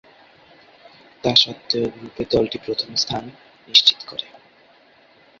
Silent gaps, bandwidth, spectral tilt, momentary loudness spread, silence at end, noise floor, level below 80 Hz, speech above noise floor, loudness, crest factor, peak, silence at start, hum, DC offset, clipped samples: none; 8 kHz; -3 dB/octave; 17 LU; 1.15 s; -53 dBFS; -54 dBFS; 32 dB; -19 LUFS; 24 dB; 0 dBFS; 1.25 s; none; under 0.1%; under 0.1%